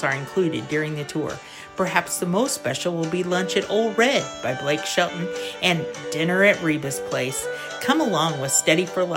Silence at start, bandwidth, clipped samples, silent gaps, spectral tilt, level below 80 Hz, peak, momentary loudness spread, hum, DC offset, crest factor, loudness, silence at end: 0 s; 16.5 kHz; under 0.1%; none; -3.5 dB/octave; -62 dBFS; -2 dBFS; 10 LU; none; under 0.1%; 20 dB; -22 LUFS; 0 s